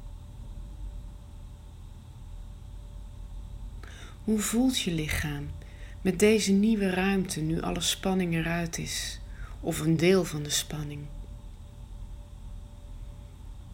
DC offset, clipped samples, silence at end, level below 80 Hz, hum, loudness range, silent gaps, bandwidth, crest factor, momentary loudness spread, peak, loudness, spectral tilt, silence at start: under 0.1%; under 0.1%; 0 s; -42 dBFS; none; 19 LU; none; 16 kHz; 20 dB; 23 LU; -10 dBFS; -28 LUFS; -4.5 dB/octave; 0 s